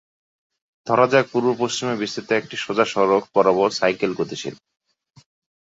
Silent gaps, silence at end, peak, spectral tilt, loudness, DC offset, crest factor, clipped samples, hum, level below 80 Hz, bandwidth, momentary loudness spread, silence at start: none; 1.05 s; -2 dBFS; -4.5 dB/octave; -20 LUFS; under 0.1%; 20 dB; under 0.1%; none; -64 dBFS; 8 kHz; 10 LU; 0.85 s